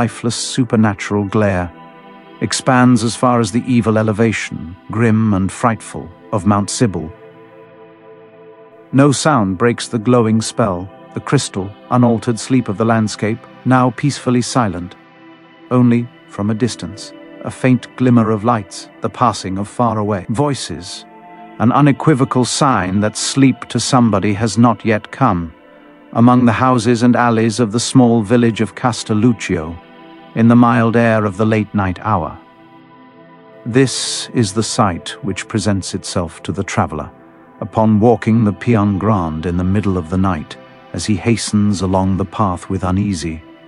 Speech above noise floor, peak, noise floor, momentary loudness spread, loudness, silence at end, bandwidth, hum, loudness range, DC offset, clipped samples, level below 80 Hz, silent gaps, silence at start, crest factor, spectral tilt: 28 dB; 0 dBFS; -42 dBFS; 13 LU; -15 LUFS; 0.15 s; 11.5 kHz; none; 5 LU; under 0.1%; under 0.1%; -46 dBFS; none; 0 s; 16 dB; -6 dB/octave